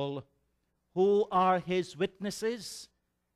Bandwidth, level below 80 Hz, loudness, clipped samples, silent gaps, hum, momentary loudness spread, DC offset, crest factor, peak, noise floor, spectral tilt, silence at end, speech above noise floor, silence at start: 14.5 kHz; -70 dBFS; -30 LUFS; under 0.1%; none; none; 16 LU; under 0.1%; 18 dB; -14 dBFS; -77 dBFS; -5.5 dB/octave; 0.5 s; 47 dB; 0 s